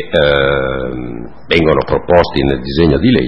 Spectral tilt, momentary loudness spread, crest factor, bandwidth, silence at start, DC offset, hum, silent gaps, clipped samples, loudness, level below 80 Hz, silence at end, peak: -8 dB/octave; 12 LU; 12 dB; 8 kHz; 0 s; 3%; none; none; 0.2%; -13 LUFS; -28 dBFS; 0 s; 0 dBFS